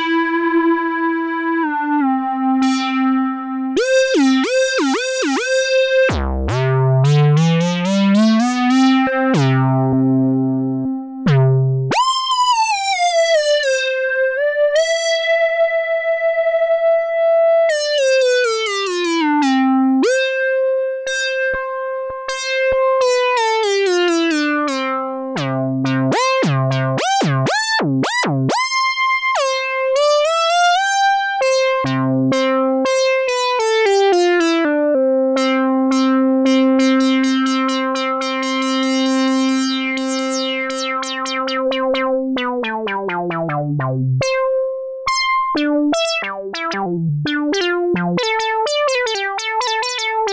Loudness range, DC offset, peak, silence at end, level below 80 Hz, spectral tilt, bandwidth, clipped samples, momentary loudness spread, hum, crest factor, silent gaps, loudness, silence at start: 4 LU; under 0.1%; -6 dBFS; 0 s; -42 dBFS; -5 dB/octave; 8 kHz; under 0.1%; 6 LU; none; 10 dB; none; -16 LUFS; 0 s